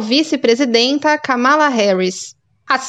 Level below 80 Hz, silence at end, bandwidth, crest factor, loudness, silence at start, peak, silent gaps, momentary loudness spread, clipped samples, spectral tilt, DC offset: -70 dBFS; 0 s; 10 kHz; 14 dB; -14 LUFS; 0 s; 0 dBFS; none; 8 LU; under 0.1%; -3.5 dB/octave; under 0.1%